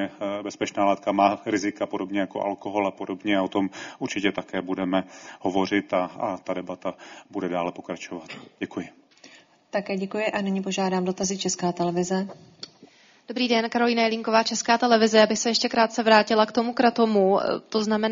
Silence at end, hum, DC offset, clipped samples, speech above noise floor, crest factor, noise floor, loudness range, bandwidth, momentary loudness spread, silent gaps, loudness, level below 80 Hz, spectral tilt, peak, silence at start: 0 s; none; under 0.1%; under 0.1%; 29 dB; 22 dB; -54 dBFS; 11 LU; 7.6 kHz; 15 LU; none; -24 LUFS; -66 dBFS; -3.5 dB/octave; -2 dBFS; 0 s